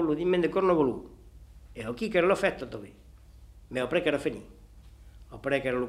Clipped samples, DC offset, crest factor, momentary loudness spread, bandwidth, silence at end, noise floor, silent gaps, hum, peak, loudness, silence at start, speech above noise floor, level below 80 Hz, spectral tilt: under 0.1%; under 0.1%; 20 dB; 19 LU; 13 kHz; 0 s; -51 dBFS; none; 50 Hz at -60 dBFS; -10 dBFS; -28 LUFS; 0 s; 24 dB; -52 dBFS; -6 dB/octave